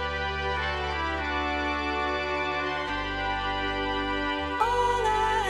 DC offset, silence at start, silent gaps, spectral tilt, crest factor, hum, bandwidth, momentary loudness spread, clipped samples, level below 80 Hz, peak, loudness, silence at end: under 0.1%; 0 s; none; -4.5 dB/octave; 16 dB; none; 13 kHz; 4 LU; under 0.1%; -40 dBFS; -12 dBFS; -28 LUFS; 0 s